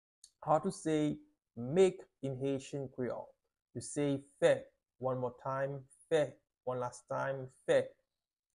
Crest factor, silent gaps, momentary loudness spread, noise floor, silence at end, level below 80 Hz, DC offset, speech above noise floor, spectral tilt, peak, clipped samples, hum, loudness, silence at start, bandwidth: 20 dB; 3.62-3.66 s; 15 LU; under -90 dBFS; 0.7 s; -72 dBFS; under 0.1%; over 55 dB; -6 dB/octave; -16 dBFS; under 0.1%; none; -36 LUFS; 0.4 s; 11.5 kHz